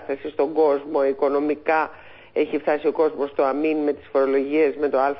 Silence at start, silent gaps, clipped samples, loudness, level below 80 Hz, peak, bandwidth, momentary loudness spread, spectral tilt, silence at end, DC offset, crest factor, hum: 0 s; none; under 0.1%; -22 LUFS; -62 dBFS; -8 dBFS; 5.6 kHz; 4 LU; -10 dB/octave; 0 s; under 0.1%; 12 dB; none